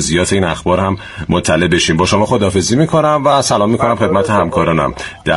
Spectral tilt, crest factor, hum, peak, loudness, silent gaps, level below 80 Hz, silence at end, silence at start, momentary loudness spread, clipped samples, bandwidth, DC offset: -4.5 dB/octave; 12 dB; none; 0 dBFS; -13 LUFS; none; -36 dBFS; 0 s; 0 s; 5 LU; under 0.1%; 11.5 kHz; under 0.1%